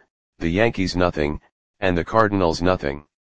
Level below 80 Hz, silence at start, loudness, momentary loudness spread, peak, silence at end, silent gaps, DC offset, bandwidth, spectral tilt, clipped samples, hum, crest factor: -40 dBFS; 0 s; -21 LUFS; 8 LU; 0 dBFS; 0.1 s; 0.10-0.33 s, 1.52-1.74 s; 1%; 9.4 kHz; -6 dB/octave; under 0.1%; none; 22 dB